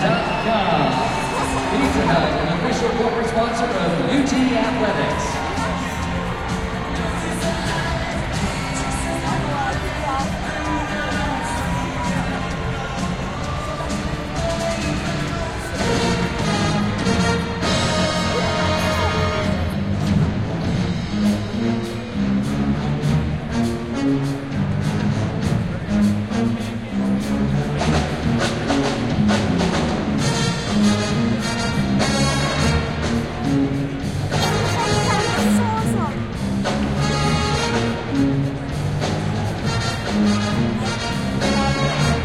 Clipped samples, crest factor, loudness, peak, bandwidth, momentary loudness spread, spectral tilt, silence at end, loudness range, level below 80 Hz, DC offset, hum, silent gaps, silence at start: under 0.1%; 16 dB; -21 LUFS; -6 dBFS; 14 kHz; 6 LU; -5.5 dB/octave; 0 s; 4 LU; -34 dBFS; under 0.1%; none; none; 0 s